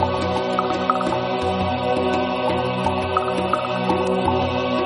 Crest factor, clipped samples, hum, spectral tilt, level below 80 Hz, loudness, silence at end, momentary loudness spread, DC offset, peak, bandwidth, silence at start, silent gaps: 16 dB; under 0.1%; none; -6.5 dB/octave; -46 dBFS; -21 LUFS; 0 s; 2 LU; under 0.1%; -4 dBFS; 10.5 kHz; 0 s; none